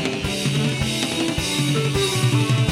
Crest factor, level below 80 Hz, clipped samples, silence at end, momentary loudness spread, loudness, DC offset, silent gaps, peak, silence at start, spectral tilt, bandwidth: 16 dB; -40 dBFS; under 0.1%; 0 s; 3 LU; -21 LUFS; under 0.1%; none; -4 dBFS; 0 s; -4.5 dB/octave; 16 kHz